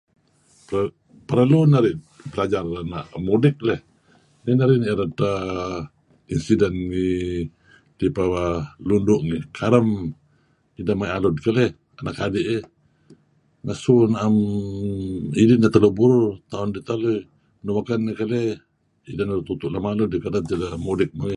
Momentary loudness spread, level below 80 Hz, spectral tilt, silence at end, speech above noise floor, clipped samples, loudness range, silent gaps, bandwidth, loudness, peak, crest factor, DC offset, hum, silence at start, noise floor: 13 LU; -46 dBFS; -8 dB/octave; 0 s; 42 dB; under 0.1%; 6 LU; none; 10.5 kHz; -22 LUFS; 0 dBFS; 22 dB; under 0.1%; none; 0.7 s; -62 dBFS